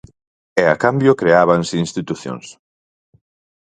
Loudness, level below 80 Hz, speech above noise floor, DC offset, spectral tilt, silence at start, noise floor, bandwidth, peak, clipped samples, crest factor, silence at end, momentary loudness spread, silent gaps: -16 LUFS; -54 dBFS; over 74 dB; under 0.1%; -6 dB/octave; 0.55 s; under -90 dBFS; 9.4 kHz; 0 dBFS; under 0.1%; 18 dB; 1.1 s; 14 LU; none